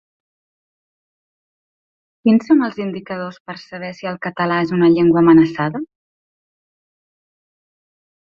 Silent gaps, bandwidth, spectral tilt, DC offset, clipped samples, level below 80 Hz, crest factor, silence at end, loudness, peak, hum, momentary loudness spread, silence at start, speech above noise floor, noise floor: 3.40-3.45 s; 6.4 kHz; -8.5 dB/octave; under 0.1%; under 0.1%; -58 dBFS; 18 dB; 2.45 s; -16 LUFS; -2 dBFS; none; 18 LU; 2.25 s; over 74 dB; under -90 dBFS